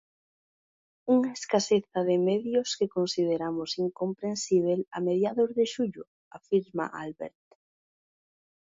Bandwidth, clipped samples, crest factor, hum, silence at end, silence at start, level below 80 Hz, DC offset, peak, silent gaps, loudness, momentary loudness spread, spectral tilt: 7.8 kHz; under 0.1%; 18 dB; none; 1.45 s; 1.05 s; -72 dBFS; under 0.1%; -10 dBFS; 6.07-6.31 s; -28 LUFS; 11 LU; -5 dB/octave